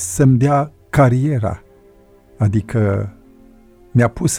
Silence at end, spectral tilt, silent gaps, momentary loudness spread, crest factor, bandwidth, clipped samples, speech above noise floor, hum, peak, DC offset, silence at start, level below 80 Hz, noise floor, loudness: 0 s; -7 dB/octave; none; 10 LU; 16 dB; 15.5 kHz; under 0.1%; 33 dB; none; -2 dBFS; under 0.1%; 0 s; -40 dBFS; -48 dBFS; -17 LUFS